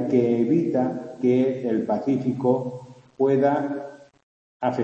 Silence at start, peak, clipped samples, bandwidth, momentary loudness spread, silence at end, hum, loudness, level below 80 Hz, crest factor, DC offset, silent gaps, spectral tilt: 0 s; -8 dBFS; under 0.1%; 7.6 kHz; 10 LU; 0 s; none; -23 LUFS; -68 dBFS; 16 dB; under 0.1%; 4.23-4.60 s; -9 dB/octave